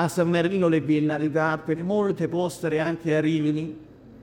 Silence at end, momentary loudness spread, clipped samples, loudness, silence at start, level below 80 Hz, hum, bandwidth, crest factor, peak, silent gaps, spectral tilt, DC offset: 0.05 s; 5 LU; under 0.1%; -24 LUFS; 0 s; -60 dBFS; none; 17 kHz; 16 dB; -8 dBFS; none; -7 dB/octave; under 0.1%